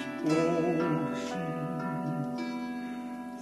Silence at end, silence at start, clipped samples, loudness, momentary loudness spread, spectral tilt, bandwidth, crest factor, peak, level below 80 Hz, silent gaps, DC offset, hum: 0 s; 0 s; under 0.1%; -32 LUFS; 10 LU; -6.5 dB/octave; 13 kHz; 16 dB; -16 dBFS; -68 dBFS; none; under 0.1%; none